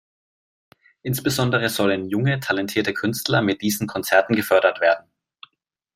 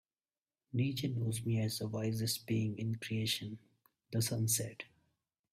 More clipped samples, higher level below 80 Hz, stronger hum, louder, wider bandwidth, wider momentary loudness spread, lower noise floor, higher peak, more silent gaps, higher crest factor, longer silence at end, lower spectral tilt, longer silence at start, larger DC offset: neither; first, -60 dBFS vs -68 dBFS; neither; first, -21 LUFS vs -36 LUFS; about the same, 16 kHz vs 16 kHz; second, 6 LU vs 10 LU; second, -71 dBFS vs under -90 dBFS; first, -2 dBFS vs -20 dBFS; neither; about the same, 20 dB vs 18 dB; first, 0.95 s vs 0.7 s; about the same, -5 dB/octave vs -4.5 dB/octave; first, 1.05 s vs 0.75 s; neither